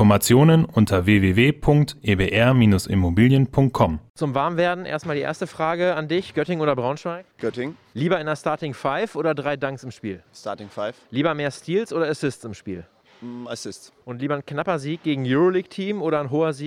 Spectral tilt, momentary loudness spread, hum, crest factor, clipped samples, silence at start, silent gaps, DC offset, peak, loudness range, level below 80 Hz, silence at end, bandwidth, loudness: -6.5 dB/octave; 16 LU; none; 18 dB; under 0.1%; 0 s; 4.10-4.14 s; under 0.1%; -4 dBFS; 9 LU; -46 dBFS; 0 s; 16.5 kHz; -21 LUFS